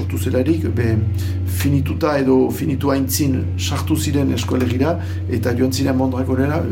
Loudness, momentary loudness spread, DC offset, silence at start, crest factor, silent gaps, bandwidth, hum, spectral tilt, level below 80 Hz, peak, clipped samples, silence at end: -18 LUFS; 5 LU; under 0.1%; 0 s; 14 dB; none; 17 kHz; none; -6 dB/octave; -46 dBFS; -4 dBFS; under 0.1%; 0 s